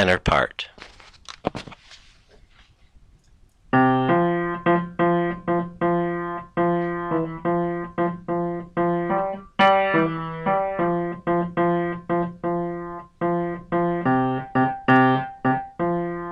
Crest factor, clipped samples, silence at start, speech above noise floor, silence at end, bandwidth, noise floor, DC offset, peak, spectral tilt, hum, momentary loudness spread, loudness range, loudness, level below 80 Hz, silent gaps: 16 dB; under 0.1%; 0 s; 31 dB; 0 s; 9.2 kHz; -55 dBFS; under 0.1%; -6 dBFS; -7.5 dB/octave; none; 10 LU; 3 LU; -23 LUFS; -46 dBFS; none